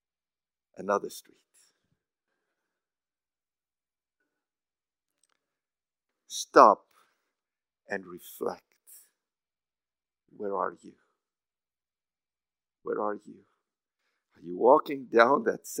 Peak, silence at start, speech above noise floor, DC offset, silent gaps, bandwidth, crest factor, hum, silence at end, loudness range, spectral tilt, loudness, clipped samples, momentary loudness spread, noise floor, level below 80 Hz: -2 dBFS; 0.8 s; over 64 dB; under 0.1%; none; 16 kHz; 30 dB; none; 0 s; 14 LU; -4 dB/octave; -26 LUFS; under 0.1%; 22 LU; under -90 dBFS; under -90 dBFS